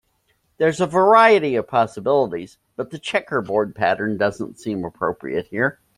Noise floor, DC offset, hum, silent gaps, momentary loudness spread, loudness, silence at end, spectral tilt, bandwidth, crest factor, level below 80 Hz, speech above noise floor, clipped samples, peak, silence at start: -66 dBFS; under 0.1%; none; none; 15 LU; -20 LUFS; 0.25 s; -5.5 dB/octave; 11.5 kHz; 18 dB; -58 dBFS; 47 dB; under 0.1%; -2 dBFS; 0.6 s